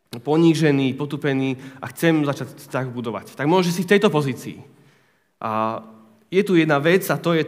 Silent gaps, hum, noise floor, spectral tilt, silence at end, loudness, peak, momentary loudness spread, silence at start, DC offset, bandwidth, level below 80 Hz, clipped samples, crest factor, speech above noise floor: none; none; -61 dBFS; -6 dB/octave; 0 s; -20 LUFS; -2 dBFS; 14 LU; 0.15 s; under 0.1%; 16 kHz; -74 dBFS; under 0.1%; 20 dB; 41 dB